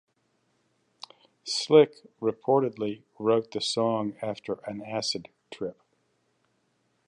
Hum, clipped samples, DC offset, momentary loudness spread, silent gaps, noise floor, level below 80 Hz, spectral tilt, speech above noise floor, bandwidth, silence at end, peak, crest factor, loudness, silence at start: none; under 0.1%; under 0.1%; 22 LU; none; -72 dBFS; -74 dBFS; -4.5 dB/octave; 46 dB; 10.5 kHz; 1.35 s; -6 dBFS; 24 dB; -27 LUFS; 1.45 s